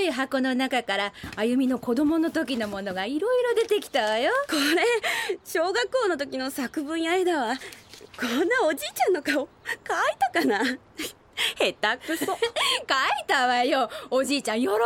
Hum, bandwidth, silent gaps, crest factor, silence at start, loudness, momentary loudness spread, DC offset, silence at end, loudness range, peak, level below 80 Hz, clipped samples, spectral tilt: none; 18 kHz; none; 16 dB; 0 s; -25 LUFS; 7 LU; under 0.1%; 0 s; 2 LU; -10 dBFS; -62 dBFS; under 0.1%; -2.5 dB/octave